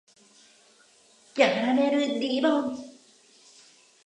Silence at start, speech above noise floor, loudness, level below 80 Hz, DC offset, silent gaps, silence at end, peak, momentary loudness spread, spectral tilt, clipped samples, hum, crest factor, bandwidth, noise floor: 1.35 s; 35 dB; -25 LUFS; -80 dBFS; under 0.1%; none; 1.15 s; -6 dBFS; 15 LU; -4 dB/octave; under 0.1%; none; 22 dB; 10 kHz; -59 dBFS